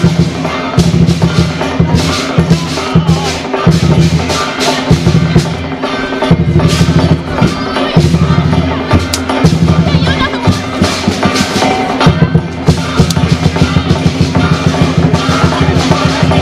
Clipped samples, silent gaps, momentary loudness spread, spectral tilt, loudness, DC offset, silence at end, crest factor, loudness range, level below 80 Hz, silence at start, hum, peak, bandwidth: 1%; none; 4 LU; -6 dB/octave; -10 LUFS; under 0.1%; 0 s; 10 dB; 1 LU; -24 dBFS; 0 s; none; 0 dBFS; 14 kHz